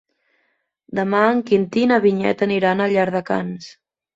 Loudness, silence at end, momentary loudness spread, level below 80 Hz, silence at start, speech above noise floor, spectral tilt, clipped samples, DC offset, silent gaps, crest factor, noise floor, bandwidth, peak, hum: -18 LUFS; 0.45 s; 9 LU; -60 dBFS; 0.9 s; 50 dB; -7 dB/octave; under 0.1%; under 0.1%; none; 18 dB; -69 dBFS; 7.8 kHz; -2 dBFS; none